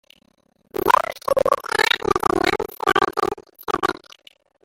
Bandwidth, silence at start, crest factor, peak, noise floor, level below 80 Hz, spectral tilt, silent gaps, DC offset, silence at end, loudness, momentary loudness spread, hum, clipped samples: 17 kHz; 0.75 s; 20 dB; -2 dBFS; -62 dBFS; -48 dBFS; -3.5 dB/octave; none; under 0.1%; 0.75 s; -20 LUFS; 9 LU; none; under 0.1%